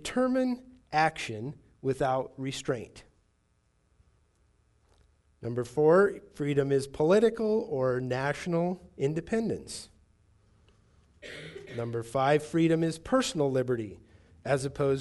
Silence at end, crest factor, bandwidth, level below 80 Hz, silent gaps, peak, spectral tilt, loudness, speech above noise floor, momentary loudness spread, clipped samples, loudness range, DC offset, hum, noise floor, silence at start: 0 s; 18 dB; 11.5 kHz; -60 dBFS; none; -12 dBFS; -6 dB/octave; -29 LUFS; 42 dB; 17 LU; under 0.1%; 10 LU; under 0.1%; none; -71 dBFS; 0 s